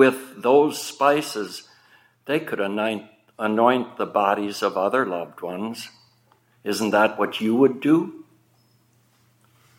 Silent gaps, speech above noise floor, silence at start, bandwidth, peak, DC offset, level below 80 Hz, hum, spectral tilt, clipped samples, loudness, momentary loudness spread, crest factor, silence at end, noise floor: none; 39 dB; 0 s; 17 kHz; -2 dBFS; under 0.1%; -76 dBFS; none; -5 dB/octave; under 0.1%; -22 LUFS; 14 LU; 20 dB; 1.55 s; -61 dBFS